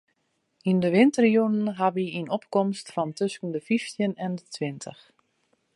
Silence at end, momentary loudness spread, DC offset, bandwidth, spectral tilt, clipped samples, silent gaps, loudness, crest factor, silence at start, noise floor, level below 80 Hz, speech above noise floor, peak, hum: 0.85 s; 13 LU; under 0.1%; 11.5 kHz; -6.5 dB/octave; under 0.1%; none; -25 LUFS; 20 dB; 0.65 s; -74 dBFS; -74 dBFS; 49 dB; -6 dBFS; none